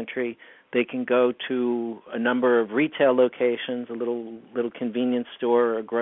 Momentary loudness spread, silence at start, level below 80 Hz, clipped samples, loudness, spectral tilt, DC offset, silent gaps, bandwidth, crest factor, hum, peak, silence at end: 10 LU; 0 s; -76 dBFS; under 0.1%; -24 LUFS; -9.5 dB/octave; under 0.1%; none; 3.9 kHz; 16 dB; none; -8 dBFS; 0 s